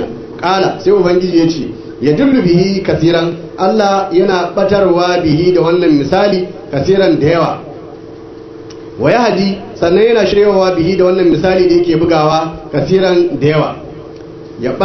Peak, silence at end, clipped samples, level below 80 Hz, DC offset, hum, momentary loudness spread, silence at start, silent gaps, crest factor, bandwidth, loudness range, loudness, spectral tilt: 0 dBFS; 0 s; under 0.1%; -40 dBFS; under 0.1%; none; 20 LU; 0 s; none; 12 dB; 6.4 kHz; 3 LU; -11 LUFS; -7 dB/octave